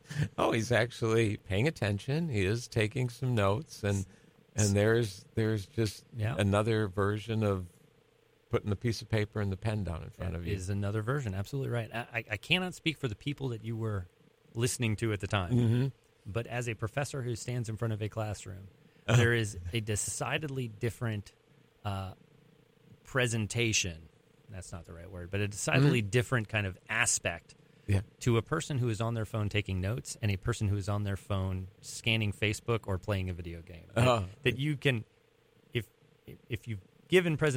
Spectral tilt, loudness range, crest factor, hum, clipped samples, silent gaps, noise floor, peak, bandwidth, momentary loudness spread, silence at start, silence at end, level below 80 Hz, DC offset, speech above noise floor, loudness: -5 dB/octave; 4 LU; 20 dB; none; under 0.1%; none; -67 dBFS; -12 dBFS; 16 kHz; 12 LU; 0.1 s; 0 s; -56 dBFS; under 0.1%; 35 dB; -32 LUFS